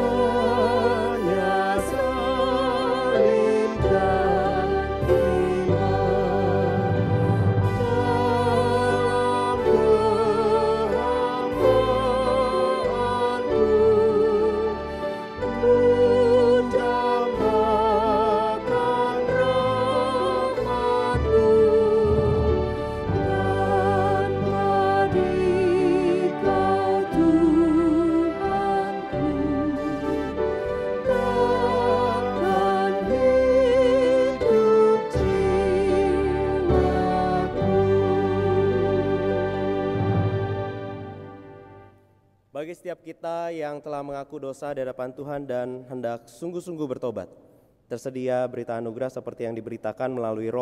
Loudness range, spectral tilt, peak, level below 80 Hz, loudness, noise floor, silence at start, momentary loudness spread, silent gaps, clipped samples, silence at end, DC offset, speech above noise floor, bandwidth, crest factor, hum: 12 LU; -7.5 dB/octave; -6 dBFS; -40 dBFS; -22 LUFS; -61 dBFS; 0 s; 13 LU; none; under 0.1%; 0 s; under 0.1%; 31 dB; 12.5 kHz; 16 dB; none